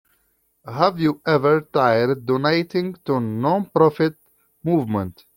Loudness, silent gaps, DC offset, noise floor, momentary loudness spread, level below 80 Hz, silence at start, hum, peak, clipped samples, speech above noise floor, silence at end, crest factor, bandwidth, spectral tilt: -20 LUFS; none; under 0.1%; -66 dBFS; 8 LU; -60 dBFS; 0.65 s; none; -2 dBFS; under 0.1%; 46 dB; 0.25 s; 20 dB; 17 kHz; -8 dB/octave